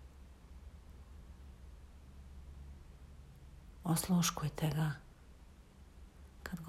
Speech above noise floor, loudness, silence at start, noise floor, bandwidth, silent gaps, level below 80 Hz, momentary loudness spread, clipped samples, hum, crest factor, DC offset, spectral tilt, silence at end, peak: 24 dB; -36 LUFS; 0 s; -58 dBFS; 16 kHz; none; -56 dBFS; 27 LU; under 0.1%; none; 20 dB; under 0.1%; -5 dB/octave; 0 s; -22 dBFS